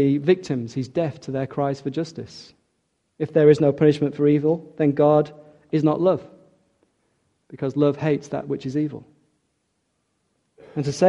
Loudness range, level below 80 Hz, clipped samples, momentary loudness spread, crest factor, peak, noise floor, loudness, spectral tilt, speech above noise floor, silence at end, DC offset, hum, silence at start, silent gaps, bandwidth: 7 LU; -62 dBFS; under 0.1%; 14 LU; 20 dB; -2 dBFS; -72 dBFS; -22 LUFS; -8 dB/octave; 51 dB; 0 s; under 0.1%; none; 0 s; none; 10.5 kHz